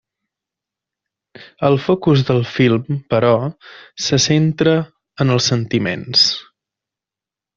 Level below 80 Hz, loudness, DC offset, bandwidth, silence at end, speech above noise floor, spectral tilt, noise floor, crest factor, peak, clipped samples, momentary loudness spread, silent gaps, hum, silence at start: -52 dBFS; -16 LUFS; under 0.1%; 7.6 kHz; 1.15 s; 72 dB; -5 dB/octave; -88 dBFS; 16 dB; -2 dBFS; under 0.1%; 8 LU; none; none; 1.4 s